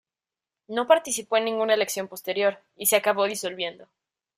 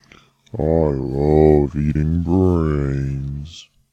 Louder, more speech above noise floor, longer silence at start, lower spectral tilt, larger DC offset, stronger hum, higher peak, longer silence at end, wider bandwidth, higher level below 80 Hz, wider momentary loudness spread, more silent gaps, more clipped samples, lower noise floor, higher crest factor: second, -24 LUFS vs -18 LUFS; first, over 65 dB vs 33 dB; first, 0.7 s vs 0.55 s; second, -1.5 dB/octave vs -9.5 dB/octave; neither; neither; second, -6 dBFS vs 0 dBFS; first, 0.55 s vs 0.3 s; first, 16 kHz vs 8 kHz; second, -74 dBFS vs -30 dBFS; second, 9 LU vs 15 LU; neither; neither; first, under -90 dBFS vs -50 dBFS; about the same, 20 dB vs 18 dB